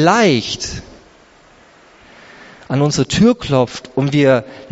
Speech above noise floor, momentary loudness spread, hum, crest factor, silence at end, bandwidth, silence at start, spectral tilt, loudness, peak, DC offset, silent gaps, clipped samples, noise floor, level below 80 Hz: 32 dB; 10 LU; none; 16 dB; 0.05 s; 8 kHz; 0 s; -5 dB/octave; -15 LUFS; 0 dBFS; under 0.1%; none; under 0.1%; -47 dBFS; -44 dBFS